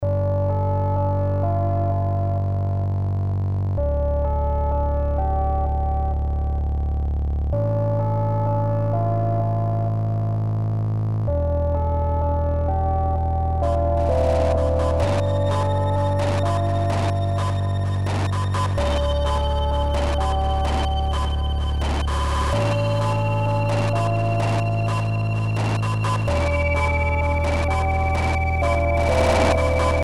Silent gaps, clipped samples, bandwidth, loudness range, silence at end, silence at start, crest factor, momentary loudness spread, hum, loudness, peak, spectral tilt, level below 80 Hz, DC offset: none; under 0.1%; 11.5 kHz; 2 LU; 0 s; 0 s; 14 dB; 3 LU; none; -22 LUFS; -8 dBFS; -7 dB/octave; -26 dBFS; 1%